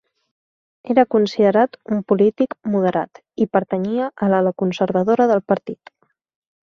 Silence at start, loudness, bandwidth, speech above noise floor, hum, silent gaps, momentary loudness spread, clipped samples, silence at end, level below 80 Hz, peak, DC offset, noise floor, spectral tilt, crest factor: 0.85 s; -18 LUFS; 7 kHz; over 72 dB; none; none; 8 LU; under 0.1%; 0.95 s; -62 dBFS; -2 dBFS; under 0.1%; under -90 dBFS; -8 dB/octave; 18 dB